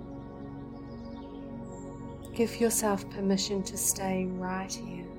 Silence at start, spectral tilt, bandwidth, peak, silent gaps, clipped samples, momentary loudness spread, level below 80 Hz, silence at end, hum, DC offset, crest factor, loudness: 0 s; -4 dB/octave; 16.5 kHz; -12 dBFS; none; under 0.1%; 16 LU; -52 dBFS; 0 s; none; under 0.1%; 22 dB; -31 LUFS